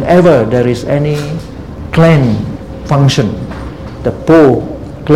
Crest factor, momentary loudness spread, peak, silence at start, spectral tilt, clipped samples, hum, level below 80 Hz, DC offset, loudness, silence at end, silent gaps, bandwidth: 10 dB; 17 LU; 0 dBFS; 0 s; -7.5 dB/octave; 0.7%; none; -30 dBFS; 0.9%; -10 LUFS; 0 s; none; 13 kHz